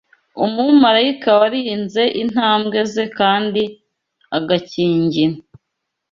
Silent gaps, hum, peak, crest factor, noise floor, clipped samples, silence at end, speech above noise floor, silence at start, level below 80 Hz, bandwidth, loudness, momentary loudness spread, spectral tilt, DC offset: none; none; -2 dBFS; 16 dB; -77 dBFS; under 0.1%; 0.7 s; 61 dB; 0.35 s; -60 dBFS; 7.4 kHz; -16 LUFS; 9 LU; -6 dB/octave; under 0.1%